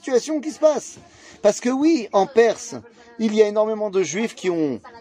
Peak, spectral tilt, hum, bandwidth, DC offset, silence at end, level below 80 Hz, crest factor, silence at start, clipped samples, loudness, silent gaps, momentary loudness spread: -2 dBFS; -4.5 dB/octave; none; 11 kHz; under 0.1%; 0 s; -66 dBFS; 18 dB; 0.05 s; under 0.1%; -20 LUFS; none; 10 LU